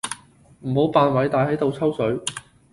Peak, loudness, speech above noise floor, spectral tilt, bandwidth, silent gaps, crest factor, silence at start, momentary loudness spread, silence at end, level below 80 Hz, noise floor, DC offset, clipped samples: -4 dBFS; -21 LUFS; 30 dB; -5.5 dB/octave; 11.5 kHz; none; 18 dB; 0.05 s; 16 LU; 0.35 s; -54 dBFS; -50 dBFS; under 0.1%; under 0.1%